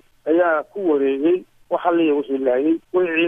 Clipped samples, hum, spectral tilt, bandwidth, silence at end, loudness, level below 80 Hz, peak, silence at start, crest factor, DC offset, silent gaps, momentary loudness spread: under 0.1%; none; -7.5 dB/octave; 3.7 kHz; 0 s; -20 LUFS; -64 dBFS; -4 dBFS; 0.25 s; 14 dB; under 0.1%; none; 4 LU